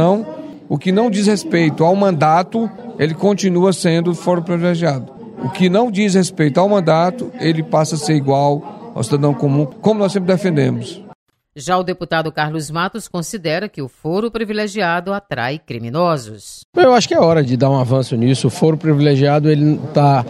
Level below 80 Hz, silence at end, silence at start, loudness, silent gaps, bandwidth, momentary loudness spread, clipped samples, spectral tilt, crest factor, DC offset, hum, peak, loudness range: -56 dBFS; 0 s; 0 s; -16 LUFS; 11.15-11.26 s, 16.65-16.73 s; 13 kHz; 11 LU; under 0.1%; -6.5 dB/octave; 16 dB; under 0.1%; none; 0 dBFS; 6 LU